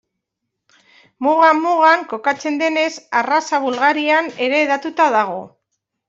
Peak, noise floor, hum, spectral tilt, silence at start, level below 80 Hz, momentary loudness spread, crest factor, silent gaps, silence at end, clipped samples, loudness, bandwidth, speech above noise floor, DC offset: -2 dBFS; -78 dBFS; none; -3 dB/octave; 1.2 s; -70 dBFS; 7 LU; 16 dB; none; 0.6 s; under 0.1%; -16 LUFS; 7.8 kHz; 62 dB; under 0.1%